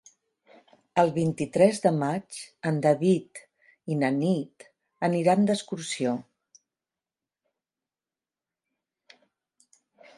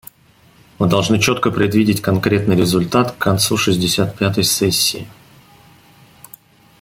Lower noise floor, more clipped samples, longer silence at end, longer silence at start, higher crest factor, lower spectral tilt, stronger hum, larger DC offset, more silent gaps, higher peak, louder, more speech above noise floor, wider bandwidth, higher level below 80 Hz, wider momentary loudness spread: first, under -90 dBFS vs -51 dBFS; neither; first, 3.95 s vs 1.7 s; first, 0.95 s vs 0.8 s; first, 22 dB vs 16 dB; first, -6.5 dB/octave vs -4.5 dB/octave; neither; neither; neither; second, -8 dBFS vs -2 dBFS; second, -26 LUFS vs -16 LUFS; first, over 65 dB vs 35 dB; second, 11.5 kHz vs 16.5 kHz; second, -70 dBFS vs -48 dBFS; first, 13 LU vs 3 LU